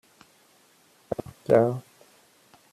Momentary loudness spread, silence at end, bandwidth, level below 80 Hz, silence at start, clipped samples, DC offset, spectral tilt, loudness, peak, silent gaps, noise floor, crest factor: 14 LU; 0.9 s; 14 kHz; -64 dBFS; 1.1 s; under 0.1%; under 0.1%; -8 dB/octave; -26 LUFS; -6 dBFS; none; -60 dBFS; 24 dB